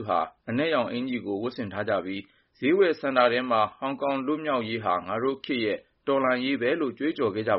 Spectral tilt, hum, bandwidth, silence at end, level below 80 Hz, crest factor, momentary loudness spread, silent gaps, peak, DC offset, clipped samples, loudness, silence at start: -3.5 dB/octave; none; 5.8 kHz; 0 s; -68 dBFS; 18 dB; 8 LU; none; -8 dBFS; under 0.1%; under 0.1%; -27 LUFS; 0 s